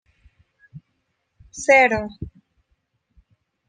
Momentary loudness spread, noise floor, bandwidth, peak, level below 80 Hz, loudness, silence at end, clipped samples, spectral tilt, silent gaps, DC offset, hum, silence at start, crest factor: 24 LU; -73 dBFS; 9.8 kHz; -2 dBFS; -52 dBFS; -17 LUFS; 1.4 s; under 0.1%; -4 dB/octave; none; under 0.1%; none; 0.75 s; 22 dB